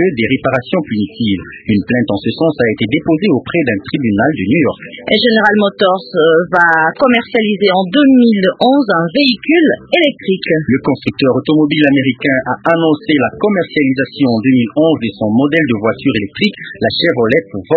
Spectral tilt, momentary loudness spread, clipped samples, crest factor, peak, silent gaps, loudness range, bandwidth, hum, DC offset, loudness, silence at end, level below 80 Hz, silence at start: -8 dB/octave; 6 LU; under 0.1%; 12 dB; 0 dBFS; none; 4 LU; 5.2 kHz; none; under 0.1%; -12 LUFS; 0 s; -46 dBFS; 0 s